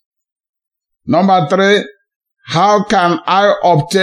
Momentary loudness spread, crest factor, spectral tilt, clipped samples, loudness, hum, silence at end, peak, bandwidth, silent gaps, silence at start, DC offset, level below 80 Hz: 7 LU; 14 dB; -5.5 dB/octave; under 0.1%; -12 LUFS; none; 0 s; 0 dBFS; 12.5 kHz; 2.16-2.20 s; 1.05 s; under 0.1%; -52 dBFS